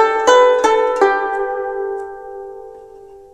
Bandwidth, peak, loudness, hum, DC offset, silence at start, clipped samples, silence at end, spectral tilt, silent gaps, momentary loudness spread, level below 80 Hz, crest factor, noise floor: 11.5 kHz; 0 dBFS; -15 LUFS; none; under 0.1%; 0 s; under 0.1%; 0.15 s; -1.5 dB/octave; none; 21 LU; -52 dBFS; 16 dB; -39 dBFS